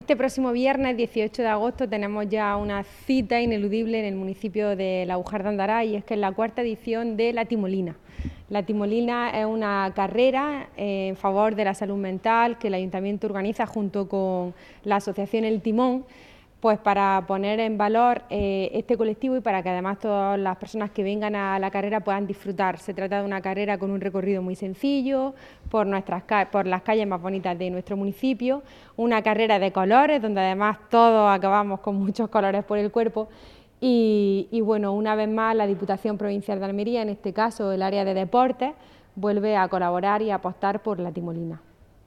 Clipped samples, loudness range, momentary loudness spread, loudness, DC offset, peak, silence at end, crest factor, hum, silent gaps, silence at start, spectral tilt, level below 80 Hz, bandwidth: under 0.1%; 5 LU; 8 LU; -24 LUFS; under 0.1%; -4 dBFS; 0.5 s; 20 dB; none; none; 0 s; -7 dB/octave; -52 dBFS; 12.5 kHz